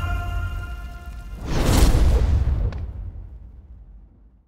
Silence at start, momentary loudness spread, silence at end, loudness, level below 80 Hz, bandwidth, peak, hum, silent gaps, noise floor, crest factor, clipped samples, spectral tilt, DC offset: 0 s; 21 LU; 0.4 s; -23 LUFS; -24 dBFS; 16 kHz; -4 dBFS; none; none; -49 dBFS; 18 dB; under 0.1%; -6 dB/octave; under 0.1%